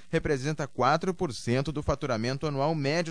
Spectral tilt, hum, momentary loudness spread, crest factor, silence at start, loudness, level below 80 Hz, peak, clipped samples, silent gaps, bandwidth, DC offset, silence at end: -6 dB/octave; none; 5 LU; 16 dB; 0.1 s; -29 LUFS; -46 dBFS; -12 dBFS; under 0.1%; none; 10.5 kHz; 0.5%; 0 s